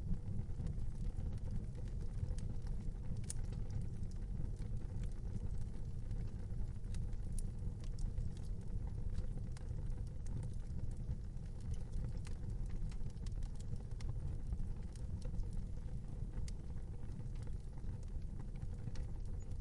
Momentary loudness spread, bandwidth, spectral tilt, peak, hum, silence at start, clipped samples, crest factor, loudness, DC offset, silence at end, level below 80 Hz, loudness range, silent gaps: 3 LU; 11.5 kHz; -7 dB/octave; -26 dBFS; none; 0 s; under 0.1%; 14 dB; -47 LUFS; under 0.1%; 0 s; -44 dBFS; 2 LU; none